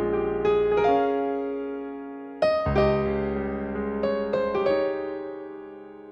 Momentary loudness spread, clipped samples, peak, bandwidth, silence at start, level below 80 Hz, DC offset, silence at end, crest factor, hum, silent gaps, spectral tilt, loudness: 15 LU; under 0.1%; -8 dBFS; 6.4 kHz; 0 s; -44 dBFS; under 0.1%; 0 s; 16 dB; none; none; -8 dB/octave; -25 LUFS